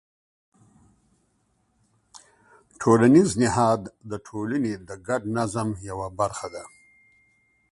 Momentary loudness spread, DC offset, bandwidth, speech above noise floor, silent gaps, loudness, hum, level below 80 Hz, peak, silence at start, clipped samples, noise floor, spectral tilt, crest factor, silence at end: 19 LU; under 0.1%; 11.5 kHz; 46 dB; none; -23 LUFS; none; -54 dBFS; -4 dBFS; 2.8 s; under 0.1%; -69 dBFS; -6 dB/octave; 22 dB; 1.05 s